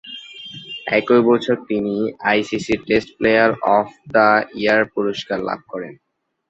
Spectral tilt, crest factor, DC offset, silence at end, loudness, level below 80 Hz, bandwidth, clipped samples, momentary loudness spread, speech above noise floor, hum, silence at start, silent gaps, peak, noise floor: -5.5 dB/octave; 18 dB; under 0.1%; 0.55 s; -18 LUFS; -54 dBFS; 8 kHz; under 0.1%; 16 LU; 19 dB; none; 0.05 s; none; -2 dBFS; -36 dBFS